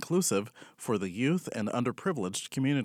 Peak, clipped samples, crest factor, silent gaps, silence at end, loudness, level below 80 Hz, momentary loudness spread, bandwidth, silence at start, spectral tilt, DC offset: -16 dBFS; under 0.1%; 14 dB; none; 0 s; -31 LUFS; -76 dBFS; 6 LU; 17.5 kHz; 0 s; -5 dB/octave; under 0.1%